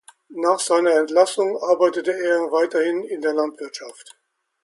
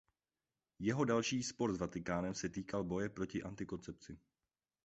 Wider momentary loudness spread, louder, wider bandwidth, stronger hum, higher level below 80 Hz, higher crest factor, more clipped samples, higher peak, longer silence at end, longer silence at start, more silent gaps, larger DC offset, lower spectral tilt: about the same, 16 LU vs 15 LU; first, -20 LUFS vs -40 LUFS; first, 11.5 kHz vs 8 kHz; neither; second, -76 dBFS vs -64 dBFS; about the same, 18 dB vs 20 dB; neither; first, -2 dBFS vs -22 dBFS; about the same, 0.7 s vs 0.7 s; second, 0.3 s vs 0.8 s; neither; neither; second, -2.5 dB/octave vs -5.5 dB/octave